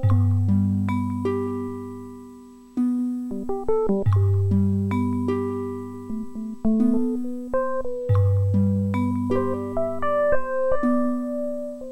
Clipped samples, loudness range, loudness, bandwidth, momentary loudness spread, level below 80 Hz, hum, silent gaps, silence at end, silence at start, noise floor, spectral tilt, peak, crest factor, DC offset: under 0.1%; 3 LU; -24 LUFS; 8.4 kHz; 12 LU; -46 dBFS; none; none; 0 s; 0 s; -44 dBFS; -10 dB/octave; -8 dBFS; 14 dB; under 0.1%